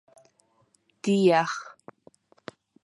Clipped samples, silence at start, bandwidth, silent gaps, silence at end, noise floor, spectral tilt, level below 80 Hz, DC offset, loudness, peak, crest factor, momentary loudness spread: under 0.1%; 1.05 s; 11.5 kHz; none; 1.15 s; -67 dBFS; -5.5 dB/octave; -78 dBFS; under 0.1%; -24 LUFS; -8 dBFS; 20 dB; 26 LU